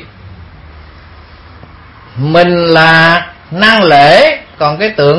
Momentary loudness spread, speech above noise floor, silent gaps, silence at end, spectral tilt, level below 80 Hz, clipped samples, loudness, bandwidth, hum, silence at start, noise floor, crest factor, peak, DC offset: 11 LU; 28 dB; none; 0 s; -6 dB/octave; -40 dBFS; 1%; -7 LUFS; 11 kHz; none; 0 s; -35 dBFS; 10 dB; 0 dBFS; under 0.1%